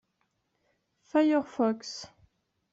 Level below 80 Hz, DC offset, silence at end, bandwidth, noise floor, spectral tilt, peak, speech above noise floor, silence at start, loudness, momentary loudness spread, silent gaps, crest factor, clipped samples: -74 dBFS; under 0.1%; 0.65 s; 7.8 kHz; -77 dBFS; -5 dB/octave; -14 dBFS; 50 dB; 1.15 s; -28 LUFS; 17 LU; none; 18 dB; under 0.1%